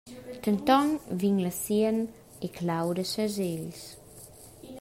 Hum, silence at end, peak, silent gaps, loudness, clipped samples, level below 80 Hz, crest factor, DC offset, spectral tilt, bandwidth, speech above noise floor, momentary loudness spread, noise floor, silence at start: none; 0 s; -10 dBFS; none; -28 LUFS; under 0.1%; -62 dBFS; 20 dB; under 0.1%; -5.5 dB/octave; 16 kHz; 21 dB; 23 LU; -49 dBFS; 0.05 s